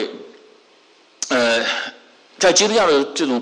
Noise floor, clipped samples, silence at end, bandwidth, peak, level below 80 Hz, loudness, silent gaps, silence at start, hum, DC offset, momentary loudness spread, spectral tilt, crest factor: -52 dBFS; under 0.1%; 0 s; 11.5 kHz; -6 dBFS; -60 dBFS; -17 LUFS; none; 0 s; none; under 0.1%; 15 LU; -1.5 dB/octave; 14 dB